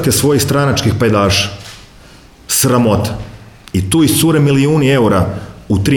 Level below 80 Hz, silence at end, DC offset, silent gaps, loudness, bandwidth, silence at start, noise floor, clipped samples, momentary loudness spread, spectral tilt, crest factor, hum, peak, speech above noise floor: -36 dBFS; 0 s; under 0.1%; none; -12 LUFS; 19.5 kHz; 0 s; -40 dBFS; under 0.1%; 11 LU; -5 dB/octave; 12 dB; none; 0 dBFS; 28 dB